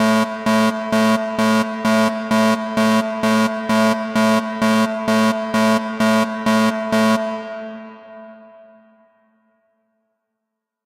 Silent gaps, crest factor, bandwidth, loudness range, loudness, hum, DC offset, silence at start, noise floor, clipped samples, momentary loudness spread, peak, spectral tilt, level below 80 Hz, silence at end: none; 14 dB; 16 kHz; 7 LU; -17 LUFS; none; under 0.1%; 0 s; -80 dBFS; under 0.1%; 4 LU; -4 dBFS; -5 dB/octave; -60 dBFS; 2.4 s